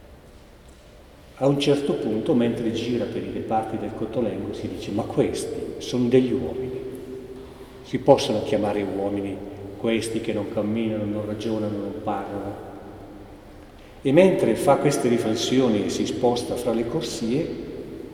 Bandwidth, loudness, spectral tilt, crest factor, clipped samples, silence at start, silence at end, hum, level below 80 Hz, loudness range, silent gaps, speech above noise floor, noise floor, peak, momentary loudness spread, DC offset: 16 kHz; -24 LUFS; -6 dB/octave; 24 dB; under 0.1%; 0 s; 0 s; none; -50 dBFS; 6 LU; none; 24 dB; -47 dBFS; 0 dBFS; 16 LU; under 0.1%